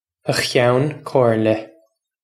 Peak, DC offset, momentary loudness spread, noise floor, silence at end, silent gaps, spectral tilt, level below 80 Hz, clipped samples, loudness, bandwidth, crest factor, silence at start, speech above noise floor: 0 dBFS; under 0.1%; 6 LU; -58 dBFS; 0.6 s; none; -5.5 dB/octave; -58 dBFS; under 0.1%; -18 LUFS; 14.5 kHz; 18 dB; 0.25 s; 41 dB